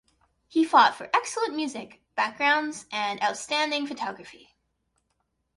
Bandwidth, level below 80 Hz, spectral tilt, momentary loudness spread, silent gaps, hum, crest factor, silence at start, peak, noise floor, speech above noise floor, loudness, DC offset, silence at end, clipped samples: 11.5 kHz; -74 dBFS; -2 dB/octave; 14 LU; none; none; 22 dB; 0.5 s; -6 dBFS; -76 dBFS; 50 dB; -25 LUFS; under 0.1%; 1.2 s; under 0.1%